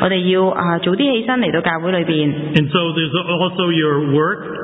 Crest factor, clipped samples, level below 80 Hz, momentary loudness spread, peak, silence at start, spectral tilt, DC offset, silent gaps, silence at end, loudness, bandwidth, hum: 16 dB; under 0.1%; -52 dBFS; 3 LU; 0 dBFS; 0 s; -8.5 dB/octave; under 0.1%; none; 0 s; -16 LUFS; 4 kHz; none